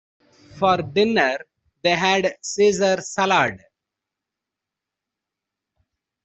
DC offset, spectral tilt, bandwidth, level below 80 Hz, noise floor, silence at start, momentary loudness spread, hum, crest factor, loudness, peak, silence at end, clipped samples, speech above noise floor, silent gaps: under 0.1%; -3.5 dB/octave; 8.2 kHz; -62 dBFS; -85 dBFS; 0.55 s; 7 LU; none; 20 dB; -20 LUFS; -4 dBFS; 2.65 s; under 0.1%; 66 dB; none